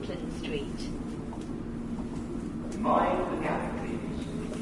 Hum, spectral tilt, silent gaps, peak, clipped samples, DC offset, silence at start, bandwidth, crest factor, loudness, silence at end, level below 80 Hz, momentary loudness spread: none; -6.5 dB/octave; none; -12 dBFS; under 0.1%; under 0.1%; 0 s; 11.5 kHz; 20 dB; -33 LUFS; 0 s; -44 dBFS; 11 LU